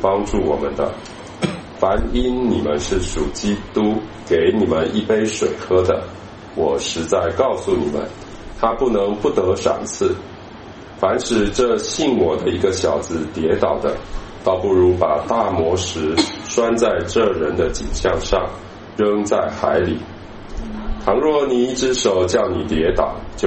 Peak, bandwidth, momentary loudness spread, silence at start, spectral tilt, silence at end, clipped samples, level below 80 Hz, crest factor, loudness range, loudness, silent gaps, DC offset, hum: 0 dBFS; 8.8 kHz; 13 LU; 0 s; -5 dB/octave; 0 s; under 0.1%; -34 dBFS; 18 dB; 2 LU; -19 LUFS; none; under 0.1%; none